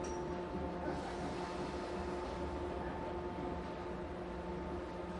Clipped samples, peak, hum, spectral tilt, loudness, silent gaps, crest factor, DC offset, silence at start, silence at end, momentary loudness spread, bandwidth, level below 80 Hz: under 0.1%; -28 dBFS; none; -6.5 dB/octave; -42 LUFS; none; 14 dB; under 0.1%; 0 s; 0 s; 3 LU; 11.5 kHz; -52 dBFS